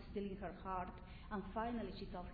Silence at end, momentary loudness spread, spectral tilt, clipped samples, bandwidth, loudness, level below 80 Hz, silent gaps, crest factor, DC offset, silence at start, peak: 0 s; 6 LU; -5.5 dB/octave; under 0.1%; 4.9 kHz; -47 LUFS; -56 dBFS; none; 16 dB; under 0.1%; 0 s; -30 dBFS